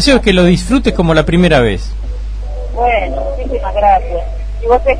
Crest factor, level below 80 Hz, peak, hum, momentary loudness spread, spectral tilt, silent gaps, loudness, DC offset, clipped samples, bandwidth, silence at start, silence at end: 12 dB; -20 dBFS; 0 dBFS; none; 14 LU; -6 dB/octave; none; -12 LUFS; under 0.1%; under 0.1%; 10.5 kHz; 0 s; 0 s